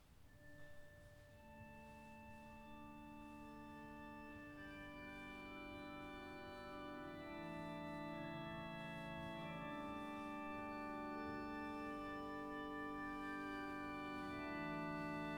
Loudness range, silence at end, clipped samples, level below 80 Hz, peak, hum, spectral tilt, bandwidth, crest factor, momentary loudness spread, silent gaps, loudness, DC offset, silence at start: 10 LU; 0 s; under 0.1%; -68 dBFS; -34 dBFS; none; -6 dB/octave; over 20 kHz; 16 dB; 12 LU; none; -50 LUFS; under 0.1%; 0 s